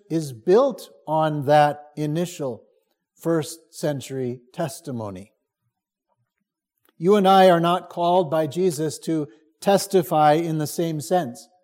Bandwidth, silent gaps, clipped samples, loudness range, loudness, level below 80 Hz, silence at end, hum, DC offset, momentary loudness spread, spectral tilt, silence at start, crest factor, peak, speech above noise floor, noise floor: 16.5 kHz; none; under 0.1%; 10 LU; -21 LUFS; -72 dBFS; 0.2 s; none; under 0.1%; 14 LU; -5.5 dB/octave; 0.1 s; 18 dB; -4 dBFS; 59 dB; -80 dBFS